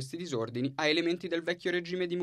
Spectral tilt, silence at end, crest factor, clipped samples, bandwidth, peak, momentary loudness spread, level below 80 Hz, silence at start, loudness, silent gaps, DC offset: -5 dB/octave; 0 s; 18 dB; under 0.1%; 12.5 kHz; -14 dBFS; 7 LU; -74 dBFS; 0 s; -32 LUFS; none; under 0.1%